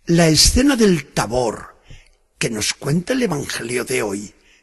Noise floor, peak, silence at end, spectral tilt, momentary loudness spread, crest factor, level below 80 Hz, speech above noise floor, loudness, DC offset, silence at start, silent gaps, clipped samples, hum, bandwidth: -45 dBFS; -2 dBFS; 0.35 s; -4 dB/octave; 13 LU; 18 dB; -32 dBFS; 27 dB; -17 LUFS; under 0.1%; 0.05 s; none; under 0.1%; none; 12.5 kHz